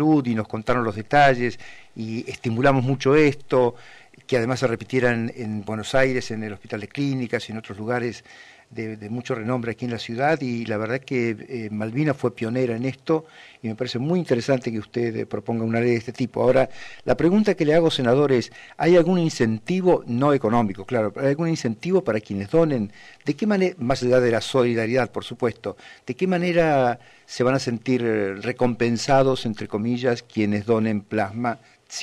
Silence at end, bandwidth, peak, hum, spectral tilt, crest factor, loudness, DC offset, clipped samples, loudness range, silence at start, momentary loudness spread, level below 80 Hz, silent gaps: 0 s; 12 kHz; -8 dBFS; none; -6.5 dB/octave; 14 dB; -22 LUFS; under 0.1%; under 0.1%; 6 LU; 0 s; 12 LU; -50 dBFS; none